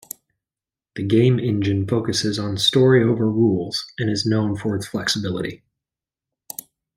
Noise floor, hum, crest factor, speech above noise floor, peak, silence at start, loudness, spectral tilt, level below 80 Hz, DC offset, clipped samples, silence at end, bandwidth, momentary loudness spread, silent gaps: under -90 dBFS; none; 18 dB; over 71 dB; -4 dBFS; 0.95 s; -20 LUFS; -5.5 dB/octave; -56 dBFS; under 0.1%; under 0.1%; 1.4 s; 16 kHz; 19 LU; none